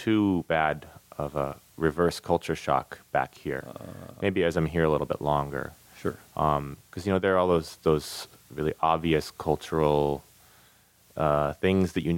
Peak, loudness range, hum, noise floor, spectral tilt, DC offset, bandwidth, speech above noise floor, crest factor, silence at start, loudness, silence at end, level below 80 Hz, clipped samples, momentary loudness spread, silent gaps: -10 dBFS; 2 LU; none; -60 dBFS; -6.5 dB/octave; under 0.1%; 17 kHz; 33 dB; 18 dB; 0 s; -27 LUFS; 0 s; -48 dBFS; under 0.1%; 12 LU; none